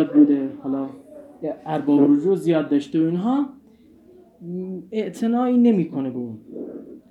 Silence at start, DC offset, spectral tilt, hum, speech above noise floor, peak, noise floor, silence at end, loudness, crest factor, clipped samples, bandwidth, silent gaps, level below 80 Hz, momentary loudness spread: 0 s; under 0.1%; -8.5 dB/octave; none; 31 dB; -4 dBFS; -51 dBFS; 0.15 s; -21 LUFS; 18 dB; under 0.1%; 11 kHz; none; -70 dBFS; 18 LU